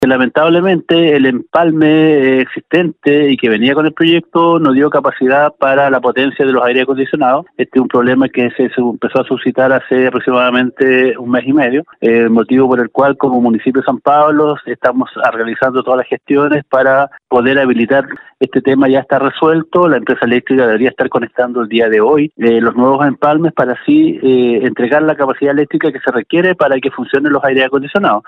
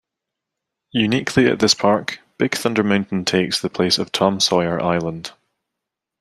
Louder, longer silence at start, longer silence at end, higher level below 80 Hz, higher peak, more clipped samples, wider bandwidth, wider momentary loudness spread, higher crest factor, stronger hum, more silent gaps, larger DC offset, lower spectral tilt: first, -11 LUFS vs -18 LUFS; second, 0 s vs 0.95 s; second, 0.1 s vs 0.9 s; about the same, -56 dBFS vs -56 dBFS; about the same, 0 dBFS vs -2 dBFS; neither; second, 5 kHz vs 14 kHz; second, 5 LU vs 9 LU; second, 10 dB vs 18 dB; neither; neither; neither; first, -8 dB/octave vs -4 dB/octave